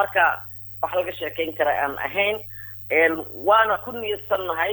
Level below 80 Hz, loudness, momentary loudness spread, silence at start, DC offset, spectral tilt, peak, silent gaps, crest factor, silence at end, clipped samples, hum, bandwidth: -58 dBFS; -22 LUFS; 12 LU; 0 s; under 0.1%; -5.5 dB/octave; -6 dBFS; none; 16 dB; 0 s; under 0.1%; none; over 20 kHz